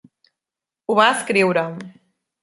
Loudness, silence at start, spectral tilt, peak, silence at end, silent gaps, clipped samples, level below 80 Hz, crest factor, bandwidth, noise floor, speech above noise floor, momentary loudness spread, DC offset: -18 LUFS; 0.9 s; -4 dB/octave; -2 dBFS; 0.55 s; none; under 0.1%; -70 dBFS; 20 dB; 11.5 kHz; -88 dBFS; 70 dB; 17 LU; under 0.1%